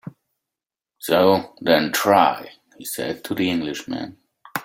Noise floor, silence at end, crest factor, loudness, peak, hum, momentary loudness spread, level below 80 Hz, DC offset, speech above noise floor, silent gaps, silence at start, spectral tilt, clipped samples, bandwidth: -88 dBFS; 0 s; 20 dB; -20 LUFS; -2 dBFS; none; 16 LU; -62 dBFS; under 0.1%; 68 dB; none; 0.05 s; -4 dB/octave; under 0.1%; 16.5 kHz